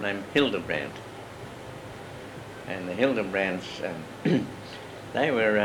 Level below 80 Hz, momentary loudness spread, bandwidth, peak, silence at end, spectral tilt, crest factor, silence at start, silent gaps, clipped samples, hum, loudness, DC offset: -60 dBFS; 16 LU; 18 kHz; -8 dBFS; 0 s; -5.5 dB/octave; 20 dB; 0 s; none; under 0.1%; none; -28 LUFS; under 0.1%